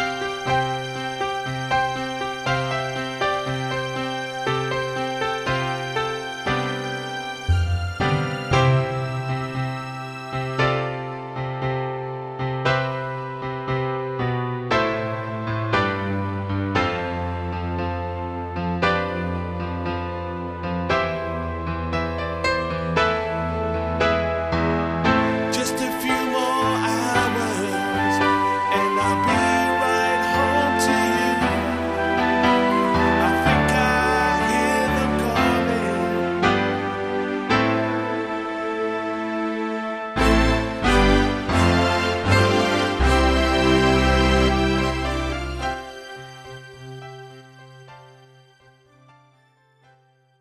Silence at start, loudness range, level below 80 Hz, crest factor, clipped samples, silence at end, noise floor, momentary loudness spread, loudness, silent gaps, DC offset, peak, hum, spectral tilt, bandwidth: 0 s; 7 LU; -34 dBFS; 20 dB; under 0.1%; 2.3 s; -59 dBFS; 10 LU; -22 LUFS; none; under 0.1%; -2 dBFS; none; -5.5 dB/octave; 15.5 kHz